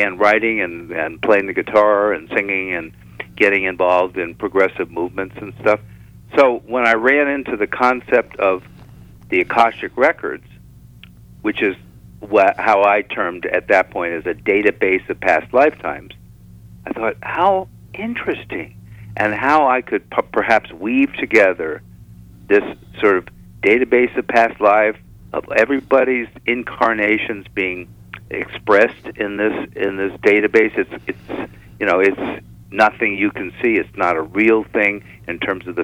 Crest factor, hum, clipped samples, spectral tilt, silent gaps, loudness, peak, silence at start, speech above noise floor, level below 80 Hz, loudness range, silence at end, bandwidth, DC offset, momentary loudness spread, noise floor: 16 dB; 60 Hz at -50 dBFS; under 0.1%; -6 dB/octave; none; -17 LUFS; -2 dBFS; 0 s; 25 dB; -50 dBFS; 3 LU; 0 s; 15 kHz; under 0.1%; 14 LU; -42 dBFS